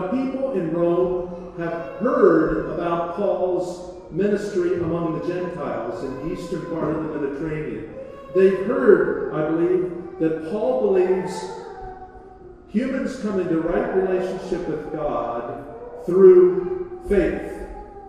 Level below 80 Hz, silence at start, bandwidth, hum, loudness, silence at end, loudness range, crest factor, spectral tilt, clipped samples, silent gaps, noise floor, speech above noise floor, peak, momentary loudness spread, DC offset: -46 dBFS; 0 s; 9.8 kHz; none; -22 LUFS; 0 s; 6 LU; 20 dB; -8 dB/octave; under 0.1%; none; -43 dBFS; 23 dB; -2 dBFS; 16 LU; under 0.1%